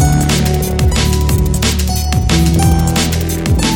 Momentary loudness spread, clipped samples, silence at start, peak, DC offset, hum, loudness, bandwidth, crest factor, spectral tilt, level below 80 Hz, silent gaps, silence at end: 3 LU; under 0.1%; 0 s; -2 dBFS; under 0.1%; none; -13 LUFS; 17.5 kHz; 10 dB; -5 dB/octave; -16 dBFS; none; 0 s